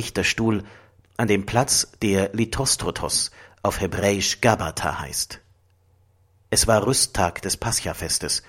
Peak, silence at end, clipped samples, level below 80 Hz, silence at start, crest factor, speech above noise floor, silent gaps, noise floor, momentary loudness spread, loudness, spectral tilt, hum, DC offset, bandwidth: -2 dBFS; 0.1 s; under 0.1%; -42 dBFS; 0 s; 22 dB; 37 dB; none; -60 dBFS; 8 LU; -22 LUFS; -3 dB/octave; none; under 0.1%; 16.5 kHz